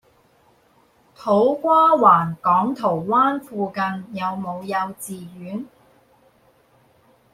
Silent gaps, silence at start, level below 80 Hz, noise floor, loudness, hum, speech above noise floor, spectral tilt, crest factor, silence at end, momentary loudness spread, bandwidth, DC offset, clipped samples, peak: none; 1.2 s; -64 dBFS; -58 dBFS; -19 LUFS; none; 38 dB; -6.5 dB/octave; 20 dB; 1.65 s; 18 LU; 16 kHz; under 0.1%; under 0.1%; -2 dBFS